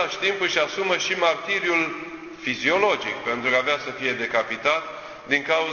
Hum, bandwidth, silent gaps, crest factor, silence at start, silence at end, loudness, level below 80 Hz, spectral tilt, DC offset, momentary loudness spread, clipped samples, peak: none; 7.2 kHz; none; 20 dB; 0 s; 0 s; -23 LUFS; -62 dBFS; -2.5 dB/octave; under 0.1%; 8 LU; under 0.1%; -4 dBFS